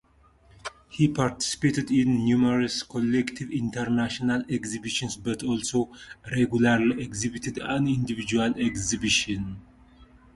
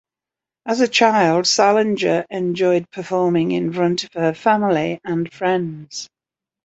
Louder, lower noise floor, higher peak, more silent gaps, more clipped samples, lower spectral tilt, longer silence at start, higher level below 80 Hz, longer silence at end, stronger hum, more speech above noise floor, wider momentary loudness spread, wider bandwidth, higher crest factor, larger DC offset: second, -26 LUFS vs -18 LUFS; second, -58 dBFS vs -88 dBFS; second, -8 dBFS vs -2 dBFS; neither; neither; about the same, -4.5 dB/octave vs -4.5 dB/octave; about the same, 0.65 s vs 0.65 s; first, -52 dBFS vs -64 dBFS; second, 0.3 s vs 0.6 s; neither; second, 33 dB vs 70 dB; about the same, 10 LU vs 11 LU; first, 11.5 kHz vs 8.2 kHz; about the same, 18 dB vs 18 dB; neither